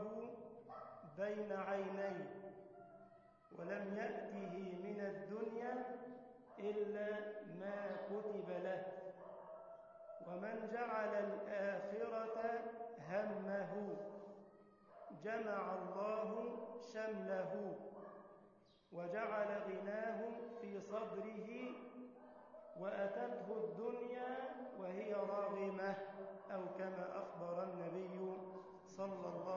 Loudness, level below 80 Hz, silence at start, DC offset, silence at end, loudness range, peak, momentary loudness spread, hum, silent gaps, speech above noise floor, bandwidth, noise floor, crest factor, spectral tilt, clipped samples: -46 LUFS; -88 dBFS; 0 s; under 0.1%; 0 s; 4 LU; -30 dBFS; 14 LU; none; none; 24 dB; 7 kHz; -69 dBFS; 16 dB; -5.5 dB/octave; under 0.1%